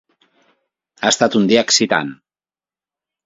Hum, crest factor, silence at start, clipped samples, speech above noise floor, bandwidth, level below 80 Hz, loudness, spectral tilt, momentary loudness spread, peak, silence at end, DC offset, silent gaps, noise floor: none; 20 dB; 1 s; under 0.1%; over 75 dB; 8 kHz; -62 dBFS; -15 LUFS; -3 dB/octave; 8 LU; 0 dBFS; 1.1 s; under 0.1%; none; under -90 dBFS